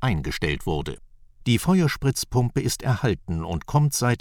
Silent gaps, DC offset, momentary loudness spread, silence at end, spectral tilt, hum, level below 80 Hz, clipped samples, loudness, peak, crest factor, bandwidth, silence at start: none; under 0.1%; 8 LU; 0.05 s; -5.5 dB/octave; none; -40 dBFS; under 0.1%; -24 LUFS; -6 dBFS; 18 dB; 18.5 kHz; 0 s